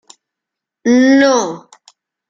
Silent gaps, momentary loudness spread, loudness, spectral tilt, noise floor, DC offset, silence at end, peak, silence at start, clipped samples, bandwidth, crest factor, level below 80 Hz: none; 15 LU; -12 LUFS; -3.5 dB/octave; -82 dBFS; under 0.1%; 0.7 s; -2 dBFS; 0.85 s; under 0.1%; 7.6 kHz; 14 dB; -62 dBFS